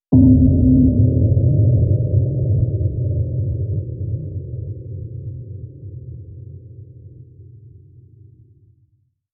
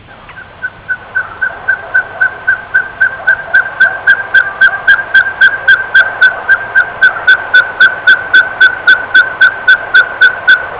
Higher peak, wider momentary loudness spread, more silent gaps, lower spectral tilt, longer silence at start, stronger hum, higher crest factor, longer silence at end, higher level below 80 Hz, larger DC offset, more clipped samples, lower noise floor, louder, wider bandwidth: about the same, -2 dBFS vs 0 dBFS; first, 22 LU vs 9 LU; neither; first, -18 dB/octave vs -4.5 dB/octave; about the same, 0.1 s vs 0.1 s; neither; first, 16 dB vs 10 dB; first, 1.65 s vs 0 s; first, -32 dBFS vs -46 dBFS; neither; neither; first, -62 dBFS vs -31 dBFS; second, -17 LUFS vs -8 LUFS; second, 1.1 kHz vs 4 kHz